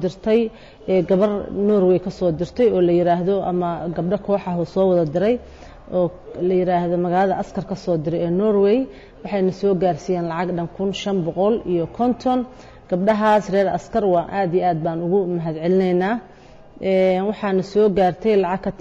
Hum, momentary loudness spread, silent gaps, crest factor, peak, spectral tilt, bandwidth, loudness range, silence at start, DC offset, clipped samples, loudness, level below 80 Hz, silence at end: none; 8 LU; none; 12 dB; -8 dBFS; -8 dB/octave; 7.8 kHz; 3 LU; 0 s; under 0.1%; under 0.1%; -20 LUFS; -48 dBFS; 0.05 s